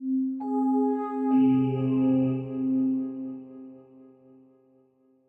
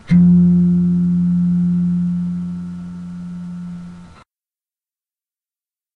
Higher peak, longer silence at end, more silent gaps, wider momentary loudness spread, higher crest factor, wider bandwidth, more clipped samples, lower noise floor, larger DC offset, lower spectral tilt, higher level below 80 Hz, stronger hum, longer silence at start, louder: second, -14 dBFS vs -4 dBFS; second, 1.45 s vs 1.9 s; neither; about the same, 17 LU vs 19 LU; about the same, 14 dB vs 14 dB; first, 3.2 kHz vs 2.3 kHz; neither; second, -63 dBFS vs under -90 dBFS; neither; about the same, -11 dB/octave vs -10.5 dB/octave; second, -70 dBFS vs -46 dBFS; neither; about the same, 0 s vs 0.05 s; second, -26 LUFS vs -15 LUFS